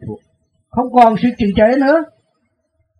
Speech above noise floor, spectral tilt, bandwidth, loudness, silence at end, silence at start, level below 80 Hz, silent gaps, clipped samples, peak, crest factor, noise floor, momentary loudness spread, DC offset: 54 dB; -8 dB/octave; 9.8 kHz; -13 LUFS; 0.95 s; 0 s; -42 dBFS; none; under 0.1%; 0 dBFS; 16 dB; -66 dBFS; 21 LU; under 0.1%